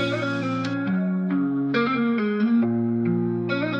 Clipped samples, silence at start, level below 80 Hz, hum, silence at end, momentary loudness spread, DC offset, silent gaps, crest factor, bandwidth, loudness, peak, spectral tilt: under 0.1%; 0 s; -66 dBFS; none; 0 s; 4 LU; under 0.1%; none; 12 dB; 7.8 kHz; -23 LUFS; -10 dBFS; -8 dB/octave